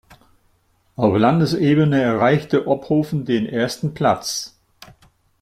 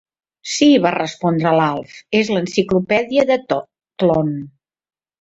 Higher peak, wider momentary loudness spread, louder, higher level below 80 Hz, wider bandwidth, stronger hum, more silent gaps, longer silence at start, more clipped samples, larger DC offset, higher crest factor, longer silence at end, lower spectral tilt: about the same, -2 dBFS vs -2 dBFS; second, 8 LU vs 11 LU; about the same, -18 LUFS vs -17 LUFS; about the same, -54 dBFS vs -54 dBFS; first, 14.5 kHz vs 8 kHz; neither; neither; first, 1 s vs 0.45 s; neither; neither; about the same, 18 dB vs 16 dB; first, 0.95 s vs 0.75 s; about the same, -6 dB/octave vs -5.5 dB/octave